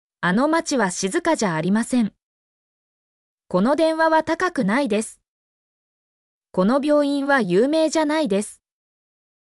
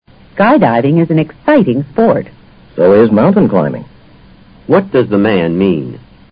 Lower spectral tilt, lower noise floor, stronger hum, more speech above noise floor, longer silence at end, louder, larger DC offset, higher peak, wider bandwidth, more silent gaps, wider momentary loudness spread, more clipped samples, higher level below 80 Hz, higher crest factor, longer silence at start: second, -5 dB/octave vs -11.5 dB/octave; first, under -90 dBFS vs -40 dBFS; neither; first, over 71 dB vs 30 dB; first, 0.9 s vs 0.35 s; second, -20 LUFS vs -11 LUFS; neither; second, -6 dBFS vs 0 dBFS; first, 12 kHz vs 5.2 kHz; first, 2.23-3.38 s, 5.28-6.41 s vs none; second, 7 LU vs 17 LU; neither; second, -62 dBFS vs -44 dBFS; about the same, 14 dB vs 12 dB; second, 0.2 s vs 0.35 s